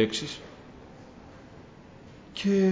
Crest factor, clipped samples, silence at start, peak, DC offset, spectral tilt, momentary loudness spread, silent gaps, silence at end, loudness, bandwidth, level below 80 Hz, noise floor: 20 dB; under 0.1%; 0 s; -10 dBFS; under 0.1%; -5.5 dB/octave; 23 LU; none; 0 s; -30 LUFS; 7.8 kHz; -58 dBFS; -49 dBFS